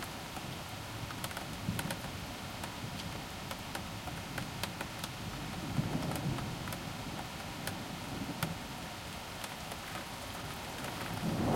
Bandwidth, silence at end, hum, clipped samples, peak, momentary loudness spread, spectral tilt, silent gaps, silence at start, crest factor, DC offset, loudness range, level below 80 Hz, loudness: 16.5 kHz; 0 s; none; under 0.1%; -16 dBFS; 6 LU; -4.5 dB/octave; none; 0 s; 24 dB; under 0.1%; 2 LU; -56 dBFS; -40 LUFS